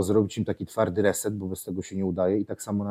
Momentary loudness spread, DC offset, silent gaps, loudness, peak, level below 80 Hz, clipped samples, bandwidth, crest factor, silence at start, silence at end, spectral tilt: 9 LU; under 0.1%; none; -27 LUFS; -10 dBFS; -58 dBFS; under 0.1%; 16 kHz; 18 dB; 0 s; 0 s; -6 dB/octave